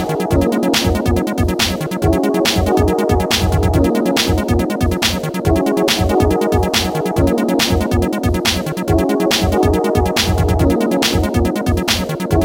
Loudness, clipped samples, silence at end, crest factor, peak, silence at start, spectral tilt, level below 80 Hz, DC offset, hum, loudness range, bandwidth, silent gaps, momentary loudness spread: -15 LUFS; under 0.1%; 0 s; 14 dB; 0 dBFS; 0 s; -5 dB/octave; -24 dBFS; under 0.1%; none; 1 LU; 17 kHz; none; 3 LU